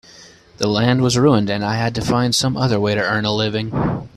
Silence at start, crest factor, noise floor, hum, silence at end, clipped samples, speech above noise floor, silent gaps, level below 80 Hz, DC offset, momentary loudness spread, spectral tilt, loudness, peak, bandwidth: 0.2 s; 16 dB; -44 dBFS; none; 0.1 s; under 0.1%; 27 dB; none; -44 dBFS; under 0.1%; 6 LU; -5 dB/octave; -18 LUFS; -2 dBFS; 13.5 kHz